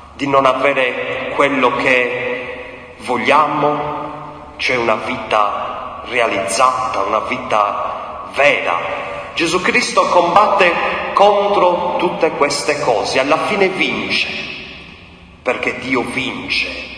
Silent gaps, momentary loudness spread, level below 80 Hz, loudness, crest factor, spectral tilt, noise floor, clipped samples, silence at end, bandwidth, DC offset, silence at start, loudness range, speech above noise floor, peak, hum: none; 12 LU; -48 dBFS; -15 LUFS; 16 dB; -3.5 dB/octave; -40 dBFS; under 0.1%; 0 s; 10.5 kHz; under 0.1%; 0 s; 4 LU; 25 dB; 0 dBFS; none